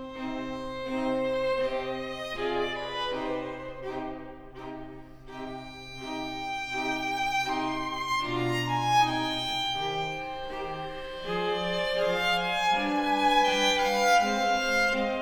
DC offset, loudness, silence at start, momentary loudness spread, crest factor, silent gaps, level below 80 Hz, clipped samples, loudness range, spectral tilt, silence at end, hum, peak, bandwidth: under 0.1%; -28 LUFS; 0 s; 16 LU; 18 dB; none; -50 dBFS; under 0.1%; 11 LU; -3.5 dB/octave; 0 s; none; -12 dBFS; 19.5 kHz